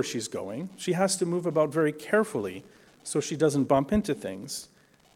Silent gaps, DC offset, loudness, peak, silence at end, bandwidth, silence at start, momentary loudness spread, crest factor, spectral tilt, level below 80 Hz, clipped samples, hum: none; under 0.1%; -28 LUFS; -10 dBFS; 0.5 s; 16.5 kHz; 0 s; 12 LU; 18 dB; -5 dB/octave; -56 dBFS; under 0.1%; none